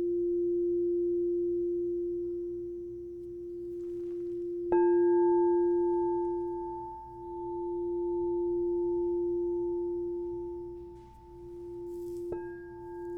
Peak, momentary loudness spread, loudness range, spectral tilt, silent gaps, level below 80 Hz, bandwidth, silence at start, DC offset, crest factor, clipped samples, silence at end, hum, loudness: -16 dBFS; 17 LU; 7 LU; -10 dB/octave; none; -58 dBFS; 2.7 kHz; 0 s; under 0.1%; 16 dB; under 0.1%; 0 s; none; -32 LUFS